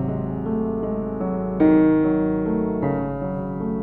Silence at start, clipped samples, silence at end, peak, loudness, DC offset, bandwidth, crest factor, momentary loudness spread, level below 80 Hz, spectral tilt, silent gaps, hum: 0 s; under 0.1%; 0 s; -6 dBFS; -22 LUFS; under 0.1%; 3.9 kHz; 16 dB; 10 LU; -42 dBFS; -12 dB/octave; none; none